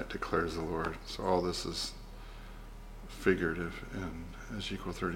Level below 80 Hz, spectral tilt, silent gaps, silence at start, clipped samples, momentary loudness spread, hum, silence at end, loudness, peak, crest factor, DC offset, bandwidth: -48 dBFS; -5 dB/octave; none; 0 s; under 0.1%; 19 LU; none; 0 s; -35 LUFS; -14 dBFS; 22 dB; under 0.1%; 16.5 kHz